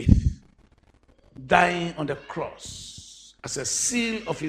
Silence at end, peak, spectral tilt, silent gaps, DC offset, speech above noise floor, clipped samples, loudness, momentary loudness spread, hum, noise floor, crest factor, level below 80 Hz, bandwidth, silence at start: 0 s; 0 dBFS; -4 dB/octave; none; under 0.1%; 33 dB; under 0.1%; -25 LUFS; 22 LU; none; -59 dBFS; 26 dB; -34 dBFS; 15 kHz; 0 s